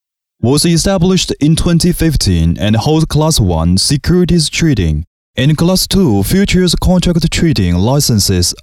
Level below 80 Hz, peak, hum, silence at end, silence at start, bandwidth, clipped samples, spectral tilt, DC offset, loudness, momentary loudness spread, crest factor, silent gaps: -24 dBFS; -2 dBFS; none; 0.1 s; 0.4 s; 16.5 kHz; under 0.1%; -5 dB/octave; under 0.1%; -11 LUFS; 3 LU; 10 dB; 5.07-5.34 s